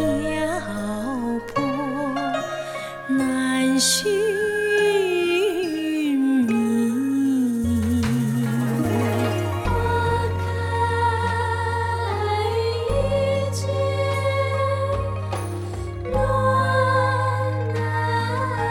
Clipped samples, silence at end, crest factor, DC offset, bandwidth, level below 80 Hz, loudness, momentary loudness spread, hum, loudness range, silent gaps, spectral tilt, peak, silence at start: under 0.1%; 0 s; 14 dB; under 0.1%; 17 kHz; -40 dBFS; -22 LUFS; 7 LU; none; 3 LU; none; -5.5 dB/octave; -8 dBFS; 0 s